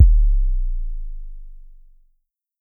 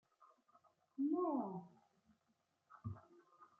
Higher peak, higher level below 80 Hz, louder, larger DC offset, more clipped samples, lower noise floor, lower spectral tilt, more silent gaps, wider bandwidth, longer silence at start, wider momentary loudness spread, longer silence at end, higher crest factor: first, 0 dBFS vs -30 dBFS; first, -20 dBFS vs -80 dBFS; first, -23 LUFS vs -43 LUFS; neither; neither; second, -68 dBFS vs -83 dBFS; about the same, -12 dB/octave vs -11 dB/octave; neither; second, 0.2 kHz vs 2.5 kHz; second, 0 s vs 0.2 s; first, 23 LU vs 17 LU; first, 1.05 s vs 0.15 s; about the same, 18 dB vs 18 dB